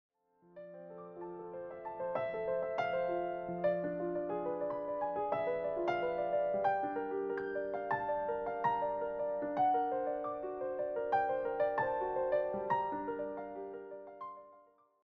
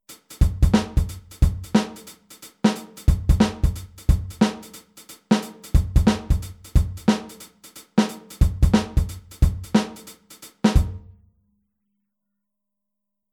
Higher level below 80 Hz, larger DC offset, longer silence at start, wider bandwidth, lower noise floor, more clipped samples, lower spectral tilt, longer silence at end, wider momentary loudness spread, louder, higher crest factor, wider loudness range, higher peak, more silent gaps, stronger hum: second, -70 dBFS vs -26 dBFS; neither; first, 0.55 s vs 0.1 s; second, 6.2 kHz vs 16.5 kHz; second, -64 dBFS vs -83 dBFS; neither; second, -4.5 dB/octave vs -6.5 dB/octave; second, 0.45 s vs 2.35 s; second, 14 LU vs 22 LU; second, -36 LUFS vs -23 LUFS; about the same, 16 dB vs 18 dB; about the same, 3 LU vs 3 LU; second, -22 dBFS vs -4 dBFS; neither; neither